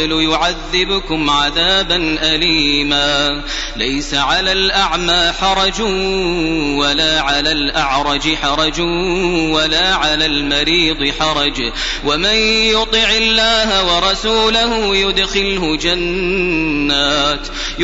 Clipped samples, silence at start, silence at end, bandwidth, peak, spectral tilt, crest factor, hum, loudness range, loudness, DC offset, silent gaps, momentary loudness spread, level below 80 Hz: under 0.1%; 0 s; 0 s; 8 kHz; -2 dBFS; -1 dB/octave; 14 dB; none; 2 LU; -13 LUFS; under 0.1%; none; 5 LU; -28 dBFS